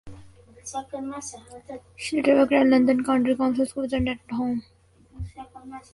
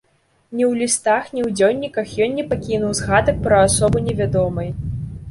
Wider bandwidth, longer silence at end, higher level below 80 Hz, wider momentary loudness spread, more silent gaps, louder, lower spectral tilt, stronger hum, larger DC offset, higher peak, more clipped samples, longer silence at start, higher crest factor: about the same, 11.5 kHz vs 11.5 kHz; first, 0.15 s vs 0 s; second, -48 dBFS vs -36 dBFS; first, 23 LU vs 11 LU; neither; second, -23 LUFS vs -18 LUFS; about the same, -5.5 dB/octave vs -5 dB/octave; neither; neither; second, -6 dBFS vs -2 dBFS; neither; second, 0.05 s vs 0.5 s; about the same, 18 dB vs 16 dB